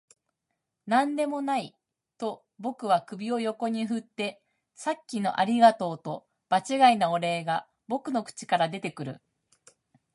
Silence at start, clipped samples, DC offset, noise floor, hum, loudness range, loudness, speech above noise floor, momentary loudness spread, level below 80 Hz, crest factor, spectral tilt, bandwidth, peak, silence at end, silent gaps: 0.85 s; under 0.1%; under 0.1%; -83 dBFS; none; 6 LU; -27 LUFS; 56 dB; 16 LU; -80 dBFS; 22 dB; -5 dB/octave; 11.5 kHz; -6 dBFS; 0.95 s; none